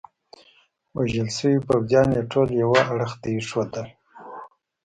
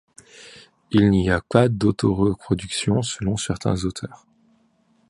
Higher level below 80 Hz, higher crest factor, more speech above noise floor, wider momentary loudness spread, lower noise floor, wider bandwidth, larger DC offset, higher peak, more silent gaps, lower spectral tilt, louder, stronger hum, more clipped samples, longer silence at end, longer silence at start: second, -52 dBFS vs -42 dBFS; about the same, 20 dB vs 22 dB; about the same, 38 dB vs 41 dB; first, 21 LU vs 10 LU; about the same, -60 dBFS vs -62 dBFS; about the same, 10.5 kHz vs 11.5 kHz; neither; second, -4 dBFS vs 0 dBFS; neither; about the same, -6 dB/octave vs -6 dB/octave; about the same, -22 LUFS vs -21 LUFS; neither; neither; second, 0.35 s vs 0.95 s; first, 0.95 s vs 0.4 s